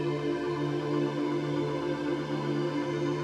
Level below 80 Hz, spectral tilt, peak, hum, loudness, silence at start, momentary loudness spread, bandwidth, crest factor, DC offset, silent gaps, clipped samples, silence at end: -62 dBFS; -7 dB/octave; -18 dBFS; none; -31 LUFS; 0 s; 2 LU; 10.5 kHz; 12 dB; under 0.1%; none; under 0.1%; 0 s